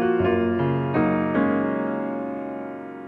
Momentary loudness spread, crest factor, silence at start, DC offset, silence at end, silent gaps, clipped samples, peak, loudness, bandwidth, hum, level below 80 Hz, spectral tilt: 10 LU; 14 dB; 0 s; under 0.1%; 0 s; none; under 0.1%; -10 dBFS; -24 LUFS; 4.4 kHz; none; -54 dBFS; -10 dB/octave